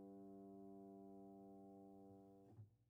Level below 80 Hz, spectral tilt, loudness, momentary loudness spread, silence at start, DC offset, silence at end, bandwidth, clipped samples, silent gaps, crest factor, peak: under -90 dBFS; -4 dB/octave; -62 LUFS; 6 LU; 0 s; under 0.1%; 0 s; 1.8 kHz; under 0.1%; none; 10 dB; -52 dBFS